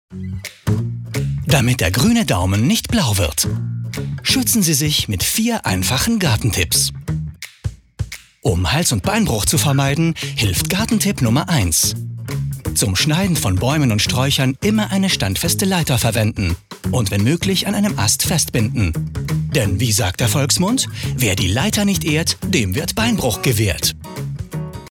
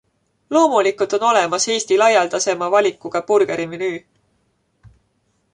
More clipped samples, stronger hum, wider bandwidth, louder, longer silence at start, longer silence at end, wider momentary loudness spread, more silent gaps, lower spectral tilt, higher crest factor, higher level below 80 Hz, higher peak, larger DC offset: neither; neither; first, 18.5 kHz vs 11 kHz; about the same, -17 LUFS vs -17 LUFS; second, 0.1 s vs 0.5 s; second, 0 s vs 0.65 s; about the same, 10 LU vs 10 LU; neither; first, -4 dB/octave vs -2.5 dB/octave; about the same, 18 dB vs 16 dB; first, -36 dBFS vs -64 dBFS; about the same, 0 dBFS vs -2 dBFS; neither